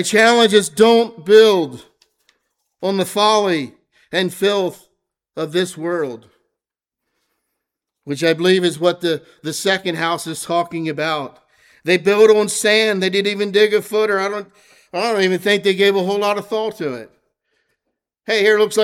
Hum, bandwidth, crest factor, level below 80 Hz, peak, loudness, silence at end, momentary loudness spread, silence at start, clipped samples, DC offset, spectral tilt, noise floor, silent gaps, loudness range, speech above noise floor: none; 16 kHz; 16 dB; -68 dBFS; 0 dBFS; -16 LUFS; 0 s; 14 LU; 0 s; under 0.1%; under 0.1%; -3.5 dB/octave; -84 dBFS; none; 7 LU; 67 dB